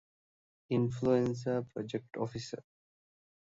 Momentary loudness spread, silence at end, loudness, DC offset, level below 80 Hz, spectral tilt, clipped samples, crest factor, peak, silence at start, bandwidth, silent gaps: 12 LU; 1 s; -34 LUFS; under 0.1%; -66 dBFS; -7.5 dB/octave; under 0.1%; 20 dB; -16 dBFS; 0.7 s; 7.8 kHz; none